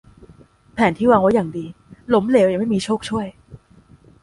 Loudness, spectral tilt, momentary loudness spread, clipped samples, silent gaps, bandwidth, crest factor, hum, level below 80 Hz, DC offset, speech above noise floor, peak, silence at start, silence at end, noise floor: -18 LUFS; -6.5 dB/octave; 18 LU; under 0.1%; none; 11.5 kHz; 18 dB; none; -50 dBFS; under 0.1%; 33 dB; -2 dBFS; 0.75 s; 0.65 s; -50 dBFS